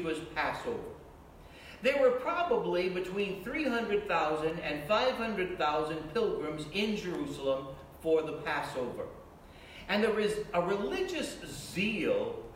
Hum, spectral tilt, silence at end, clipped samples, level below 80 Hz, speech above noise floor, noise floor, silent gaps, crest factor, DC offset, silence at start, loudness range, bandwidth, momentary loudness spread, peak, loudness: none; -5 dB/octave; 0 s; under 0.1%; -58 dBFS; 20 dB; -52 dBFS; none; 18 dB; under 0.1%; 0 s; 3 LU; 16.5 kHz; 12 LU; -14 dBFS; -32 LUFS